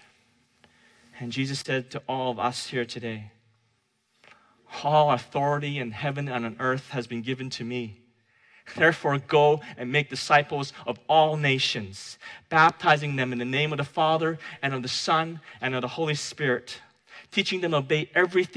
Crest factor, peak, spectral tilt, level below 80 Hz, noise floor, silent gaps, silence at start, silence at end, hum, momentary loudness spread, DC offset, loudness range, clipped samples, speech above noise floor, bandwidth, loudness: 20 dB; -6 dBFS; -5 dB/octave; -70 dBFS; -71 dBFS; none; 1.15 s; 0 s; none; 13 LU; under 0.1%; 8 LU; under 0.1%; 45 dB; 11 kHz; -25 LUFS